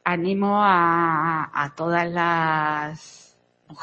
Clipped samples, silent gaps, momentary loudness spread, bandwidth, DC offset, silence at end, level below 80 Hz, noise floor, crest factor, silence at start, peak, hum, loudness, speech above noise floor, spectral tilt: under 0.1%; none; 9 LU; 8.6 kHz; under 0.1%; 0 s; -64 dBFS; -50 dBFS; 18 dB; 0.05 s; -4 dBFS; 60 Hz at -55 dBFS; -21 LUFS; 28 dB; -6.5 dB/octave